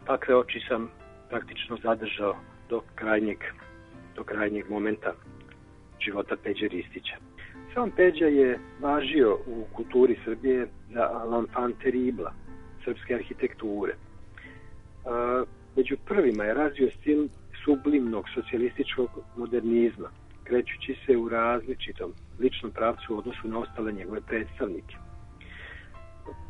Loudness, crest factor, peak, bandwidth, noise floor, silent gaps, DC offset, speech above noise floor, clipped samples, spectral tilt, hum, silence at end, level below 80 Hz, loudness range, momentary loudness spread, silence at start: -28 LUFS; 20 dB; -8 dBFS; 5.8 kHz; -51 dBFS; none; under 0.1%; 23 dB; under 0.1%; -7.5 dB/octave; none; 0 s; -50 dBFS; 8 LU; 20 LU; 0 s